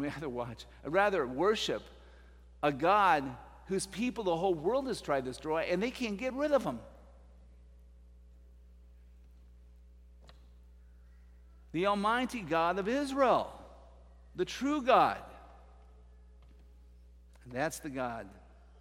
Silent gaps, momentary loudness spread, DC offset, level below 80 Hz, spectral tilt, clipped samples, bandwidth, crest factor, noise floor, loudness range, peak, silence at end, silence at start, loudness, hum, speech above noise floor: none; 16 LU; under 0.1%; -56 dBFS; -5 dB/octave; under 0.1%; 16 kHz; 22 dB; -57 dBFS; 8 LU; -12 dBFS; 0.4 s; 0 s; -32 LUFS; none; 25 dB